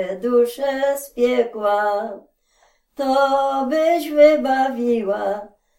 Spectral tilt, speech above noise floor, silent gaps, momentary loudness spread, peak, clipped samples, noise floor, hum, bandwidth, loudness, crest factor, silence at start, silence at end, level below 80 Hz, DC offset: -4 dB/octave; 42 dB; none; 12 LU; -2 dBFS; under 0.1%; -60 dBFS; none; 17 kHz; -19 LUFS; 18 dB; 0 s; 0.3 s; -58 dBFS; under 0.1%